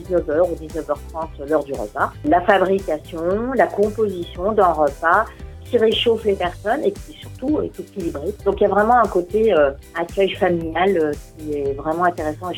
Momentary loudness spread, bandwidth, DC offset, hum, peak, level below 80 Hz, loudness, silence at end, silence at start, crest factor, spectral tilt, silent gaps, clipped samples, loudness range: 11 LU; 17.5 kHz; under 0.1%; none; -2 dBFS; -40 dBFS; -20 LUFS; 0 s; 0 s; 18 dB; -6 dB/octave; none; under 0.1%; 2 LU